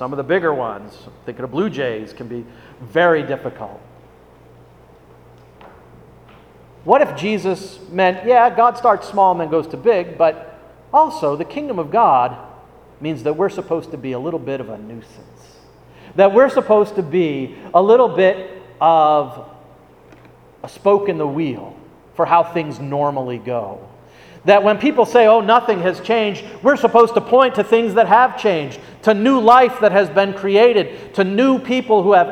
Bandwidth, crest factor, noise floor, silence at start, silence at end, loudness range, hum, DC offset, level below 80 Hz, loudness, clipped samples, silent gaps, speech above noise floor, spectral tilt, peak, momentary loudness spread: 12 kHz; 16 dB; -46 dBFS; 0 s; 0 s; 9 LU; none; under 0.1%; -56 dBFS; -16 LUFS; under 0.1%; none; 30 dB; -6.5 dB/octave; 0 dBFS; 17 LU